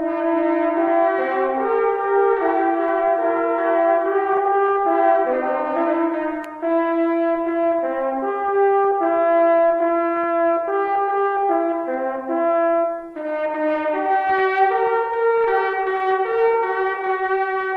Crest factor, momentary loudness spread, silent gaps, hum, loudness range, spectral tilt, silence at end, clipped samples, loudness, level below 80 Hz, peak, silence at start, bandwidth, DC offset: 12 dB; 5 LU; none; none; 2 LU; -6.5 dB/octave; 0 s; under 0.1%; -19 LUFS; -62 dBFS; -6 dBFS; 0 s; 4.9 kHz; under 0.1%